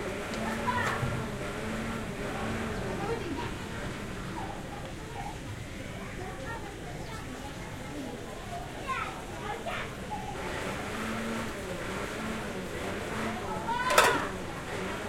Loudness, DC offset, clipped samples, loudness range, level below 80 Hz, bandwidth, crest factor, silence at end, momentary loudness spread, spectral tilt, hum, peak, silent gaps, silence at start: -34 LUFS; under 0.1%; under 0.1%; 9 LU; -48 dBFS; 16.5 kHz; 30 dB; 0 s; 10 LU; -4.5 dB/octave; none; -4 dBFS; none; 0 s